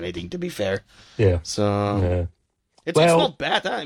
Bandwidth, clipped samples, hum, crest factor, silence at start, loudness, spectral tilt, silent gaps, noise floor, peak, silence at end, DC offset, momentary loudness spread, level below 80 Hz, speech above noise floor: 15 kHz; under 0.1%; none; 18 dB; 0 s; -22 LUFS; -5.5 dB/octave; none; -64 dBFS; -6 dBFS; 0 s; under 0.1%; 13 LU; -44 dBFS; 42 dB